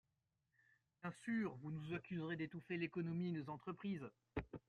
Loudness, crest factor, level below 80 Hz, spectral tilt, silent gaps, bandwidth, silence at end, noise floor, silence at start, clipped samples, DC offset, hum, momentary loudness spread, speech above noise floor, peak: -47 LUFS; 18 dB; -70 dBFS; -7.5 dB/octave; none; 10.5 kHz; 0.1 s; -88 dBFS; 1.05 s; under 0.1%; under 0.1%; none; 7 LU; 42 dB; -28 dBFS